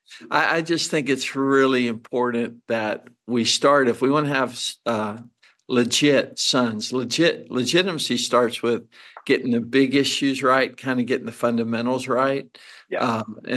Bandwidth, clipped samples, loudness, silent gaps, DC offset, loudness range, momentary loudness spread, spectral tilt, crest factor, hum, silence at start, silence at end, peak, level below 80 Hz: 12.5 kHz; under 0.1%; -21 LUFS; none; under 0.1%; 1 LU; 8 LU; -4 dB/octave; 16 dB; none; 0.1 s; 0 s; -6 dBFS; -72 dBFS